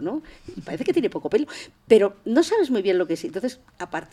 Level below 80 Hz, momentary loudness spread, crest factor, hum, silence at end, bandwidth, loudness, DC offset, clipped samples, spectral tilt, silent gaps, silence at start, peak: -58 dBFS; 17 LU; 22 dB; none; 0.1 s; 13 kHz; -23 LUFS; under 0.1%; under 0.1%; -5 dB/octave; none; 0 s; -2 dBFS